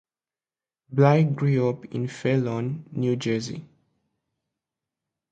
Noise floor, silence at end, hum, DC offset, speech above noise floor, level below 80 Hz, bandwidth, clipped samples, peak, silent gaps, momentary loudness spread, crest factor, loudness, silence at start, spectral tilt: under -90 dBFS; 1.65 s; none; under 0.1%; over 67 dB; -64 dBFS; 8 kHz; under 0.1%; -4 dBFS; none; 12 LU; 22 dB; -24 LUFS; 0.9 s; -7.5 dB/octave